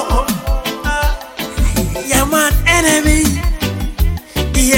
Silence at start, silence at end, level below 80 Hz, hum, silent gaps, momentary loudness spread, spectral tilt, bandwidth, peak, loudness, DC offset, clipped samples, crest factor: 0 s; 0 s; -18 dBFS; none; none; 9 LU; -3.5 dB/octave; 17 kHz; 0 dBFS; -15 LUFS; under 0.1%; under 0.1%; 14 dB